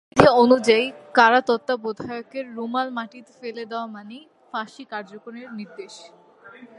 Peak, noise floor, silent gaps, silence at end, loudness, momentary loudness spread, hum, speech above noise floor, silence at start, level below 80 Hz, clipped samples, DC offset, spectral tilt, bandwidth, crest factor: 0 dBFS; -46 dBFS; none; 0.15 s; -20 LUFS; 22 LU; none; 24 dB; 0.15 s; -54 dBFS; under 0.1%; under 0.1%; -5 dB/octave; 11 kHz; 22 dB